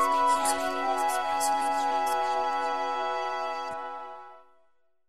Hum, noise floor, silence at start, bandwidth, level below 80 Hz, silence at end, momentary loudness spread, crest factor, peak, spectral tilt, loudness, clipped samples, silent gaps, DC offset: none; -70 dBFS; 0 s; 14.5 kHz; -66 dBFS; 0 s; 12 LU; 14 dB; -14 dBFS; -1 dB/octave; -28 LUFS; under 0.1%; none; 0.5%